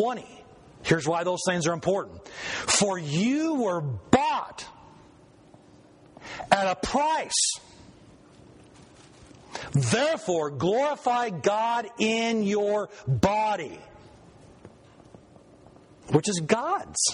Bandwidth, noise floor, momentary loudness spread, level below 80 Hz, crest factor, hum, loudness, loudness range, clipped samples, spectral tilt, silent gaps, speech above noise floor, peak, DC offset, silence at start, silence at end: 10.5 kHz; -54 dBFS; 15 LU; -56 dBFS; 26 dB; none; -26 LUFS; 5 LU; under 0.1%; -4 dB/octave; none; 28 dB; -2 dBFS; under 0.1%; 0 s; 0 s